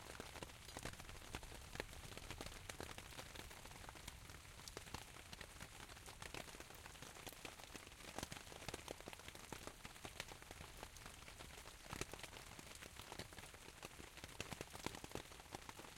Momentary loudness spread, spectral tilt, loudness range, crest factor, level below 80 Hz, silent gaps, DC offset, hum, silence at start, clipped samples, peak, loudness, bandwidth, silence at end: 5 LU; -3 dB/octave; 2 LU; 30 dB; -64 dBFS; none; under 0.1%; none; 0 s; under 0.1%; -24 dBFS; -54 LUFS; 16.5 kHz; 0 s